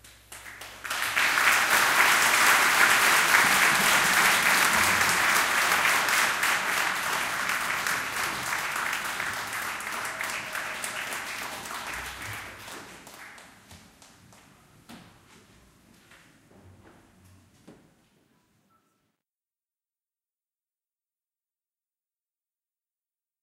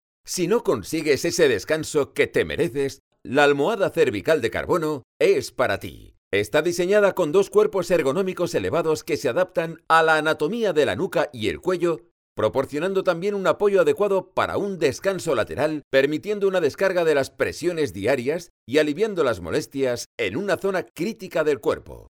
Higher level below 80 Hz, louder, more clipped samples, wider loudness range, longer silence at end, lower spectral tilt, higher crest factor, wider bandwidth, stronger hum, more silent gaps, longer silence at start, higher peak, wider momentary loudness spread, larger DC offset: second, -62 dBFS vs -54 dBFS; about the same, -23 LUFS vs -22 LUFS; neither; first, 18 LU vs 3 LU; first, 5.7 s vs 0.15 s; second, 0 dB/octave vs -4.5 dB/octave; first, 24 dB vs 18 dB; about the same, 16 kHz vs 17.5 kHz; neither; second, none vs 3.00-3.11 s, 5.04-5.20 s, 6.18-6.31 s, 12.11-12.36 s, 15.84-15.91 s, 18.50-18.67 s, 20.06-20.18 s, 20.91-20.95 s; about the same, 0.3 s vs 0.25 s; about the same, -4 dBFS vs -4 dBFS; first, 19 LU vs 7 LU; neither